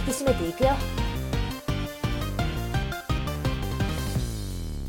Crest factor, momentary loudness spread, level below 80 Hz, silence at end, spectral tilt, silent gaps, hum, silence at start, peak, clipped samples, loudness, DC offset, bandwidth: 18 dB; 6 LU; -32 dBFS; 0 s; -5.5 dB/octave; none; none; 0 s; -8 dBFS; under 0.1%; -28 LUFS; under 0.1%; 17.5 kHz